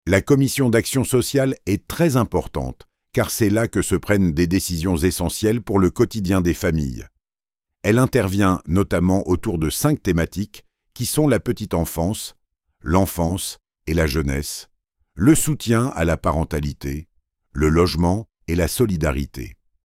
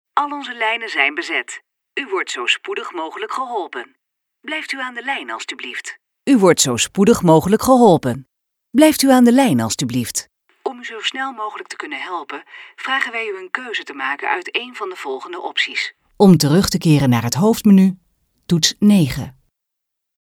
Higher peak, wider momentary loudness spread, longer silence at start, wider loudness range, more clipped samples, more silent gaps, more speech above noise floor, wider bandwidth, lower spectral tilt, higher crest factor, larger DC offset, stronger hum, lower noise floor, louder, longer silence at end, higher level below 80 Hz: about the same, -2 dBFS vs 0 dBFS; second, 12 LU vs 16 LU; about the same, 0.05 s vs 0.15 s; second, 3 LU vs 10 LU; neither; neither; first, over 71 dB vs 62 dB; second, 16 kHz vs 18 kHz; about the same, -5.5 dB/octave vs -4.5 dB/octave; about the same, 18 dB vs 18 dB; neither; neither; first, under -90 dBFS vs -79 dBFS; second, -20 LUFS vs -17 LUFS; second, 0.35 s vs 0.9 s; first, -34 dBFS vs -50 dBFS